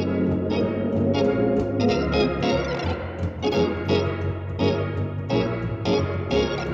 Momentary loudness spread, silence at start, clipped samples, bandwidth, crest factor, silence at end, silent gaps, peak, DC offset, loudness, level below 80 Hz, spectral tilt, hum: 6 LU; 0 s; under 0.1%; 7.4 kHz; 14 dB; 0 s; none; -10 dBFS; under 0.1%; -24 LUFS; -40 dBFS; -7.5 dB/octave; none